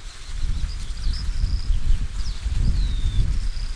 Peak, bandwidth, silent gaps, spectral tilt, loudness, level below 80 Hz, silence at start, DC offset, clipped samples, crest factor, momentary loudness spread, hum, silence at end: -8 dBFS; 10.5 kHz; none; -5 dB/octave; -28 LUFS; -22 dBFS; 0 s; under 0.1%; under 0.1%; 14 dB; 6 LU; none; 0 s